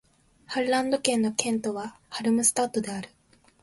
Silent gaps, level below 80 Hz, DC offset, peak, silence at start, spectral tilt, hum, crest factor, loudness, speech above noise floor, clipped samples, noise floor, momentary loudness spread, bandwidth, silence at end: none; -66 dBFS; under 0.1%; -2 dBFS; 0.5 s; -3 dB/octave; none; 26 dB; -26 LUFS; 22 dB; under 0.1%; -48 dBFS; 14 LU; 12 kHz; 0.55 s